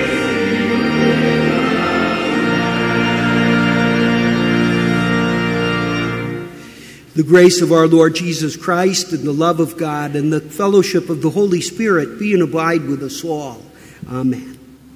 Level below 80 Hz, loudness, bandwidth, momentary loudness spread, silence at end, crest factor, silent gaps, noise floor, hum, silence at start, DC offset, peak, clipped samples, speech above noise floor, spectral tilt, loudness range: -44 dBFS; -15 LUFS; 16 kHz; 10 LU; 0.3 s; 16 dB; none; -37 dBFS; none; 0 s; under 0.1%; 0 dBFS; under 0.1%; 23 dB; -5.5 dB/octave; 4 LU